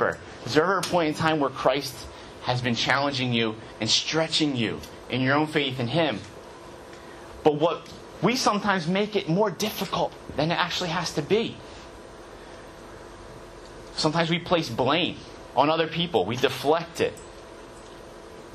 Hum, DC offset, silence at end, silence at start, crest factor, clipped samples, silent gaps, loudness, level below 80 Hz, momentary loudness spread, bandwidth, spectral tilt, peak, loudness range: none; under 0.1%; 0 s; 0 s; 22 dB; under 0.1%; none; -25 LUFS; -54 dBFS; 21 LU; 13.5 kHz; -4.5 dB/octave; -4 dBFS; 5 LU